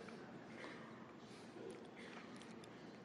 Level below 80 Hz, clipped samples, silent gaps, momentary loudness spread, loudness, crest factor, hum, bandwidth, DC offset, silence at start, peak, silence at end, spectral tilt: -86 dBFS; under 0.1%; none; 3 LU; -55 LUFS; 16 dB; none; 11.5 kHz; under 0.1%; 0 s; -38 dBFS; 0 s; -5 dB/octave